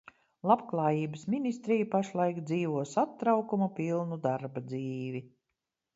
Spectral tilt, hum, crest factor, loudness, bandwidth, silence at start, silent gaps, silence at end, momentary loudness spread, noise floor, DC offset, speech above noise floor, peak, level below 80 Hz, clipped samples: -7.5 dB/octave; none; 20 dB; -31 LUFS; 8 kHz; 0.45 s; none; 0.7 s; 9 LU; -86 dBFS; under 0.1%; 55 dB; -10 dBFS; -76 dBFS; under 0.1%